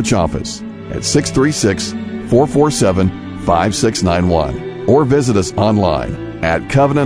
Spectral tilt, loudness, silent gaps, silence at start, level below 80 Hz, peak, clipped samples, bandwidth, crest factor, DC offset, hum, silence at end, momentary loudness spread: -5.5 dB/octave; -15 LUFS; none; 0 s; -34 dBFS; 0 dBFS; under 0.1%; 11 kHz; 14 dB; under 0.1%; none; 0 s; 9 LU